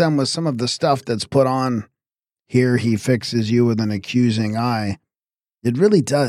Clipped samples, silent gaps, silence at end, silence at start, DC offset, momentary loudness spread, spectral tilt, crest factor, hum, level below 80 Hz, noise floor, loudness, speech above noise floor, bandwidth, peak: under 0.1%; none; 0 s; 0 s; under 0.1%; 7 LU; -6 dB/octave; 16 dB; none; -58 dBFS; under -90 dBFS; -19 LUFS; over 72 dB; 14.5 kHz; -4 dBFS